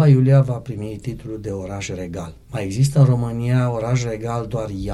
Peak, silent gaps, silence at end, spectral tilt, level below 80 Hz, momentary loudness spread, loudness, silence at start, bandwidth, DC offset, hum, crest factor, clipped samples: -4 dBFS; none; 0 s; -7.5 dB/octave; -42 dBFS; 15 LU; -21 LUFS; 0 s; 12 kHz; under 0.1%; none; 16 dB; under 0.1%